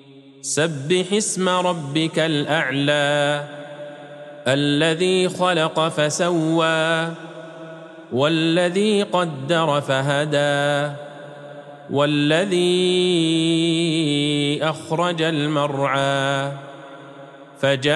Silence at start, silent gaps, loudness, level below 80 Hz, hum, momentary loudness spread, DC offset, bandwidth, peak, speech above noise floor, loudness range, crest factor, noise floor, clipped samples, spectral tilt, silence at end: 0.15 s; none; -20 LUFS; -70 dBFS; none; 19 LU; under 0.1%; 12.5 kHz; -6 dBFS; 22 dB; 2 LU; 16 dB; -41 dBFS; under 0.1%; -4.5 dB/octave; 0 s